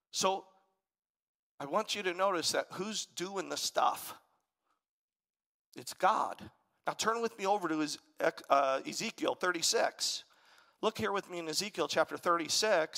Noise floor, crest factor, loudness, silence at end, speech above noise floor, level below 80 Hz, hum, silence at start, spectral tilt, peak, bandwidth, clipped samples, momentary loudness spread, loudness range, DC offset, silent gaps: -83 dBFS; 22 dB; -33 LUFS; 0 s; 49 dB; -80 dBFS; none; 0.15 s; -2 dB/octave; -12 dBFS; 16 kHz; under 0.1%; 10 LU; 5 LU; under 0.1%; 1.09-1.15 s, 1.22-1.58 s, 4.89-5.08 s, 5.16-5.20 s, 5.46-5.72 s